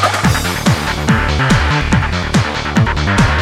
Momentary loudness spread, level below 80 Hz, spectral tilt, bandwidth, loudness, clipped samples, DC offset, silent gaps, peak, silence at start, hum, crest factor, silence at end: 3 LU; -22 dBFS; -5 dB/octave; 16 kHz; -14 LUFS; under 0.1%; under 0.1%; none; -2 dBFS; 0 s; none; 12 dB; 0 s